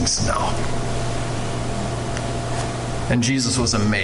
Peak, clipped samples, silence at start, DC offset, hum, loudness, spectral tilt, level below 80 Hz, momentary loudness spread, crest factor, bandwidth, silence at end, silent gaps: -8 dBFS; under 0.1%; 0 s; under 0.1%; none; -22 LUFS; -4 dB/octave; -32 dBFS; 7 LU; 12 dB; 11.5 kHz; 0 s; none